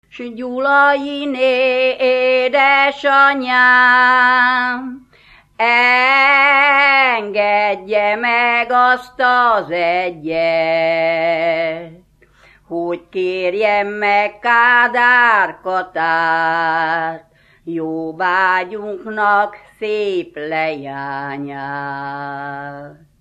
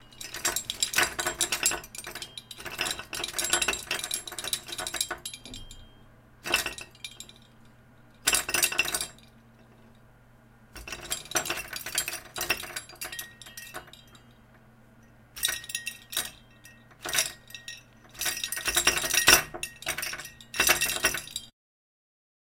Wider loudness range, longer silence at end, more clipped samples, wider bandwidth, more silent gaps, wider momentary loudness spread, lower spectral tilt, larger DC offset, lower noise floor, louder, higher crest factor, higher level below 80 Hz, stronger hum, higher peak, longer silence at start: second, 7 LU vs 11 LU; second, 0.3 s vs 1 s; neither; second, 9 kHz vs 17 kHz; neither; second, 15 LU vs 19 LU; first, -5 dB/octave vs 0 dB/octave; neither; second, -50 dBFS vs -56 dBFS; first, -14 LUFS vs -28 LUFS; second, 16 dB vs 32 dB; about the same, -58 dBFS vs -54 dBFS; neither; about the same, 0 dBFS vs 0 dBFS; first, 0.15 s vs 0 s